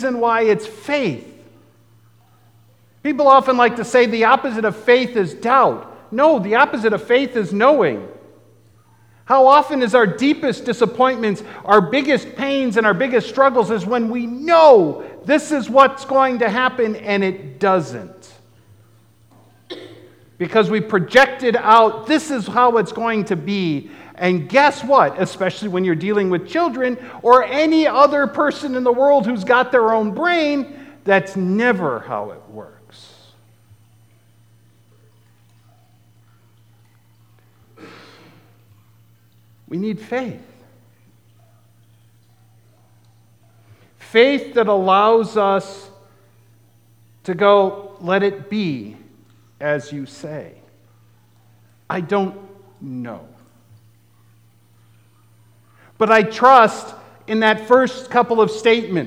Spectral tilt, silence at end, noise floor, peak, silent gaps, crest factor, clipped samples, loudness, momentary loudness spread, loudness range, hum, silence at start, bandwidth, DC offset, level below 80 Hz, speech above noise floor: -5.5 dB/octave; 0 s; -53 dBFS; 0 dBFS; none; 18 dB; under 0.1%; -16 LUFS; 15 LU; 13 LU; none; 0 s; 12.5 kHz; 0.1%; -68 dBFS; 37 dB